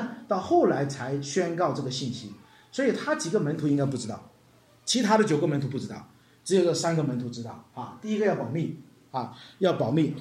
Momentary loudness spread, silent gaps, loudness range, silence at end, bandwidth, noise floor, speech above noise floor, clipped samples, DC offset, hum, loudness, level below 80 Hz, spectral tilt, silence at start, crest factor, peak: 17 LU; none; 3 LU; 0 s; 13.5 kHz; -58 dBFS; 32 dB; under 0.1%; under 0.1%; none; -27 LUFS; -70 dBFS; -5.5 dB/octave; 0 s; 18 dB; -10 dBFS